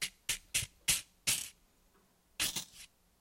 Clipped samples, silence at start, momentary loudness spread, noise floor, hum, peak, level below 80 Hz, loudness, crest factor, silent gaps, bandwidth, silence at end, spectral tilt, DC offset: under 0.1%; 0 s; 17 LU; -70 dBFS; none; -14 dBFS; -62 dBFS; -34 LUFS; 24 dB; none; 16.5 kHz; 0.35 s; 0.5 dB/octave; under 0.1%